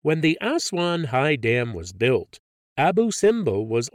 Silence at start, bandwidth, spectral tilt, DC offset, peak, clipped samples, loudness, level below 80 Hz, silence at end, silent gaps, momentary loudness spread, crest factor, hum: 0.05 s; 15 kHz; -5 dB/octave; under 0.1%; -8 dBFS; under 0.1%; -22 LUFS; -56 dBFS; 0.05 s; 2.39-2.76 s; 4 LU; 14 dB; none